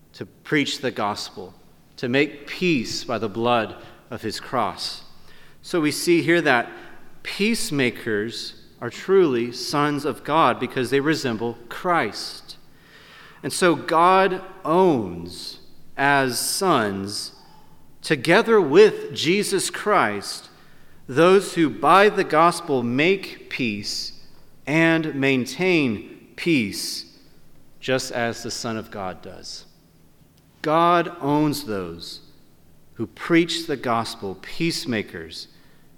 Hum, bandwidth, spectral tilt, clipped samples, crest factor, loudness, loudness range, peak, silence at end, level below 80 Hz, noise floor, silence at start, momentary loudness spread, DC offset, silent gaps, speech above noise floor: none; 17.5 kHz; -4.5 dB/octave; under 0.1%; 20 dB; -21 LUFS; 6 LU; -2 dBFS; 0.55 s; -54 dBFS; -54 dBFS; 0.15 s; 17 LU; under 0.1%; none; 32 dB